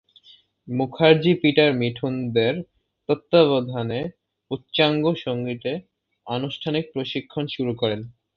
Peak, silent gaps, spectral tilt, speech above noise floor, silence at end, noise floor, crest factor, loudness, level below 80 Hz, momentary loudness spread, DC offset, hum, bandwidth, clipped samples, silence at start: -2 dBFS; none; -8.5 dB/octave; 32 dB; 0.25 s; -54 dBFS; 20 dB; -22 LUFS; -60 dBFS; 14 LU; under 0.1%; none; 6 kHz; under 0.1%; 0.65 s